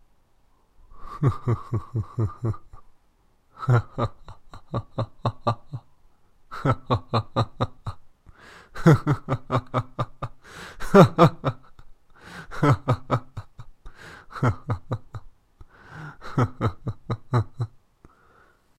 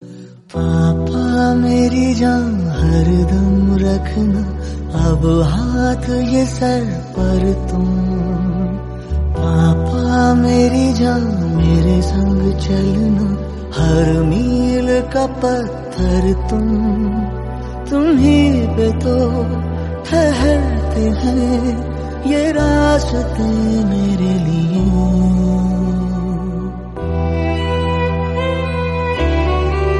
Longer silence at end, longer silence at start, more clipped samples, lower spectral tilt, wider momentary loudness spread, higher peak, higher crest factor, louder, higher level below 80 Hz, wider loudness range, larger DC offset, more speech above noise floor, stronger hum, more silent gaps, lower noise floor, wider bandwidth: first, 1.1 s vs 0 s; first, 0.95 s vs 0 s; neither; about the same, -8 dB/octave vs -7.5 dB/octave; first, 23 LU vs 8 LU; about the same, 0 dBFS vs 0 dBFS; first, 26 dB vs 14 dB; second, -25 LUFS vs -16 LUFS; second, -46 dBFS vs -22 dBFS; first, 8 LU vs 3 LU; neither; first, 40 dB vs 21 dB; neither; neither; first, -61 dBFS vs -35 dBFS; first, 14 kHz vs 11.5 kHz